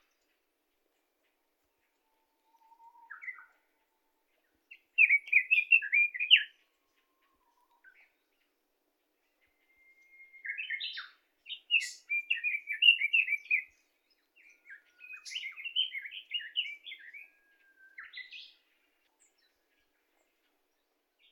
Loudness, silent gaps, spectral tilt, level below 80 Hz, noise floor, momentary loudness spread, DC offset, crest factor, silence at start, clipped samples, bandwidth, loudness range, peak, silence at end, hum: -27 LUFS; none; 5.5 dB/octave; under -90 dBFS; -79 dBFS; 23 LU; under 0.1%; 26 dB; 3.1 s; under 0.1%; 15.5 kHz; 17 LU; -10 dBFS; 2.85 s; none